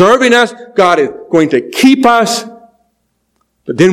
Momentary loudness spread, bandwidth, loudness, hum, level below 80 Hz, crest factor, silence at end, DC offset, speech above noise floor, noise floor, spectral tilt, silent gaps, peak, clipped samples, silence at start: 12 LU; 15.5 kHz; -10 LUFS; none; -52 dBFS; 10 dB; 0 s; under 0.1%; 53 dB; -63 dBFS; -4.5 dB/octave; none; 0 dBFS; 2%; 0 s